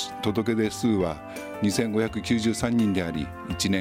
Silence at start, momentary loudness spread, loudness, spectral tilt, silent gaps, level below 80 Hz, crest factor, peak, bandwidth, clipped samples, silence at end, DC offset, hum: 0 s; 8 LU; -26 LUFS; -5 dB/octave; none; -48 dBFS; 16 dB; -10 dBFS; 16 kHz; under 0.1%; 0 s; under 0.1%; none